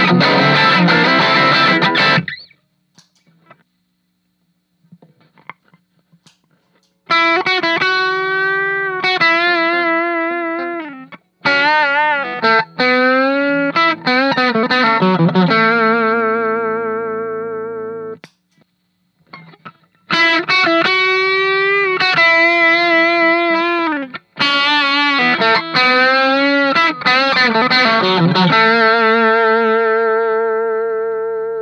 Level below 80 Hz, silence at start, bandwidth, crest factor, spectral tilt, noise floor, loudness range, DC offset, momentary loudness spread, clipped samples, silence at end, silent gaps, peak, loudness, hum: -68 dBFS; 0 s; 9.4 kHz; 14 dB; -5.5 dB/octave; -66 dBFS; 8 LU; under 0.1%; 10 LU; under 0.1%; 0 s; none; 0 dBFS; -13 LUFS; none